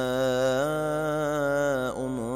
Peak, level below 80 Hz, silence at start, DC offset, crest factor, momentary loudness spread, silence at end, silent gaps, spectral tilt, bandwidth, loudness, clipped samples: -14 dBFS; -52 dBFS; 0 s; under 0.1%; 12 dB; 4 LU; 0 s; none; -5.5 dB/octave; 16 kHz; -27 LUFS; under 0.1%